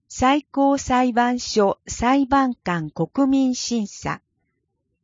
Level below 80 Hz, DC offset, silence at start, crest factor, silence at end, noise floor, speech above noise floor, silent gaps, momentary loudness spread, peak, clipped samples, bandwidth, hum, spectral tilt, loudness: -46 dBFS; under 0.1%; 0.1 s; 16 dB; 0.85 s; -74 dBFS; 54 dB; none; 8 LU; -4 dBFS; under 0.1%; 7.6 kHz; none; -4.5 dB/octave; -21 LUFS